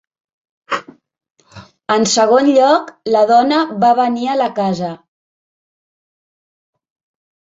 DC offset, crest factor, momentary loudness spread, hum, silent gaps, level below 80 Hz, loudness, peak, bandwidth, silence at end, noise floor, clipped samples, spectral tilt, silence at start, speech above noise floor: under 0.1%; 16 dB; 13 LU; none; 1.30-1.35 s; -62 dBFS; -14 LUFS; 0 dBFS; 8 kHz; 2.45 s; -41 dBFS; under 0.1%; -4 dB/octave; 0.7 s; 28 dB